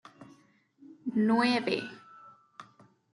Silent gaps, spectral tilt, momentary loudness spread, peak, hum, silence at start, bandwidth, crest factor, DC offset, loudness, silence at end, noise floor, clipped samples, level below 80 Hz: none; -5.5 dB/octave; 27 LU; -14 dBFS; none; 0.2 s; 11.5 kHz; 20 dB; under 0.1%; -29 LUFS; 0.5 s; -63 dBFS; under 0.1%; -80 dBFS